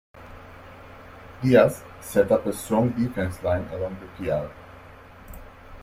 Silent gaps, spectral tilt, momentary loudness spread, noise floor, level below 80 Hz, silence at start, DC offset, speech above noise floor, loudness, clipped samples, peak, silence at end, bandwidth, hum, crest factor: none; -6.5 dB/octave; 26 LU; -46 dBFS; -50 dBFS; 0.15 s; under 0.1%; 23 dB; -24 LUFS; under 0.1%; -4 dBFS; 0 s; 16 kHz; none; 22 dB